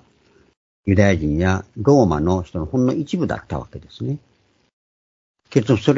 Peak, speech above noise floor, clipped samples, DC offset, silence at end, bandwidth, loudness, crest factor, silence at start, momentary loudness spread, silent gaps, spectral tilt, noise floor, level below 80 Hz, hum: 0 dBFS; 38 dB; under 0.1%; under 0.1%; 0 s; 7.8 kHz; -20 LUFS; 20 dB; 0.85 s; 15 LU; 4.73-5.34 s; -7.5 dB/octave; -56 dBFS; -40 dBFS; none